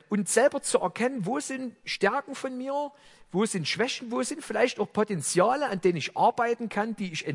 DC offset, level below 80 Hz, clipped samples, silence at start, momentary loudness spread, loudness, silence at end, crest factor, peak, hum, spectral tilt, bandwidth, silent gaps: under 0.1%; -70 dBFS; under 0.1%; 0.1 s; 9 LU; -27 LUFS; 0 s; 20 dB; -8 dBFS; none; -4 dB/octave; 12 kHz; none